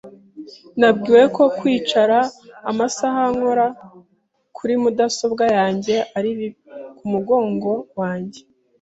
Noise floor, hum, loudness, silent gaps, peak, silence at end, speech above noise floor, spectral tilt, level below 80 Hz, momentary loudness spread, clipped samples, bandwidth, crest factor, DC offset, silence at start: -64 dBFS; none; -18 LUFS; none; -2 dBFS; 0.4 s; 47 dB; -5 dB/octave; -62 dBFS; 16 LU; under 0.1%; 8 kHz; 18 dB; under 0.1%; 0.05 s